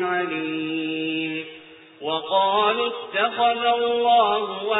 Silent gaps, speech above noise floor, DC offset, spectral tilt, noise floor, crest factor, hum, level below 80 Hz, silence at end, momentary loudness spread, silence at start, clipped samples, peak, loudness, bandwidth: none; 24 dB; under 0.1%; -8.5 dB/octave; -45 dBFS; 14 dB; none; -66 dBFS; 0 s; 9 LU; 0 s; under 0.1%; -8 dBFS; -22 LUFS; 4 kHz